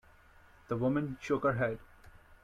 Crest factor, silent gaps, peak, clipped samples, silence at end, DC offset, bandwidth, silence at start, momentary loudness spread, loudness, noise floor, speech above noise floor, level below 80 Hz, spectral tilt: 16 dB; none; -18 dBFS; under 0.1%; 0.1 s; under 0.1%; 13.5 kHz; 0.7 s; 7 LU; -33 LUFS; -60 dBFS; 28 dB; -60 dBFS; -8 dB/octave